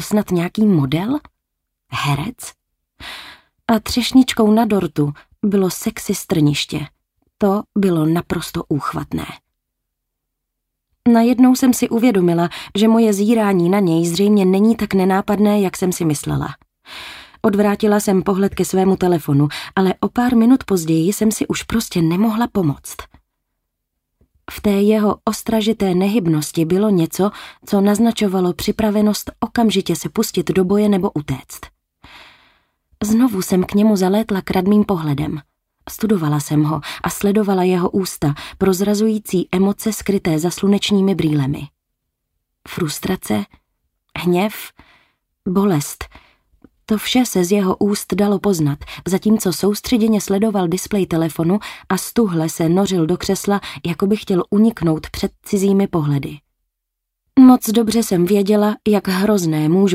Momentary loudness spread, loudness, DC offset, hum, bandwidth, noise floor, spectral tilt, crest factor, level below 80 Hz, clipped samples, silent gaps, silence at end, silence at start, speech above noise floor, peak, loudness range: 11 LU; -17 LUFS; under 0.1%; none; 16 kHz; -78 dBFS; -6 dB/octave; 16 dB; -46 dBFS; under 0.1%; none; 0 s; 0 s; 62 dB; -2 dBFS; 6 LU